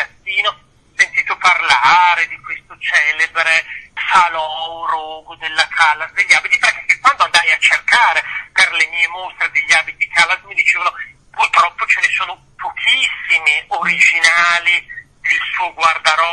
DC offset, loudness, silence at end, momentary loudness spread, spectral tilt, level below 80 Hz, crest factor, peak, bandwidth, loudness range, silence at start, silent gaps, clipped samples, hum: under 0.1%; -13 LUFS; 0 s; 12 LU; 1 dB/octave; -54 dBFS; 16 dB; 0 dBFS; 12 kHz; 3 LU; 0 s; none; under 0.1%; none